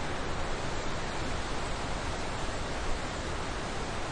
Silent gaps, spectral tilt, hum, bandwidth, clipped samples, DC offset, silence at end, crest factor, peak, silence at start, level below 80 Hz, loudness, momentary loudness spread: none; -4 dB/octave; none; 10.5 kHz; under 0.1%; under 0.1%; 0 s; 14 dB; -20 dBFS; 0 s; -38 dBFS; -35 LUFS; 1 LU